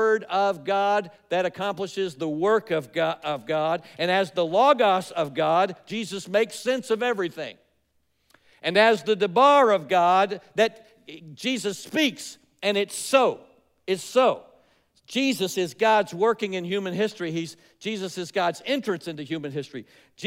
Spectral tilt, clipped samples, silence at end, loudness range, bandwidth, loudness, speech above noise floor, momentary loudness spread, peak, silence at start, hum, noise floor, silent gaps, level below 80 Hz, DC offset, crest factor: -4 dB/octave; under 0.1%; 0 s; 6 LU; 16 kHz; -24 LUFS; 46 dB; 13 LU; -6 dBFS; 0 s; none; -70 dBFS; none; -76 dBFS; under 0.1%; 18 dB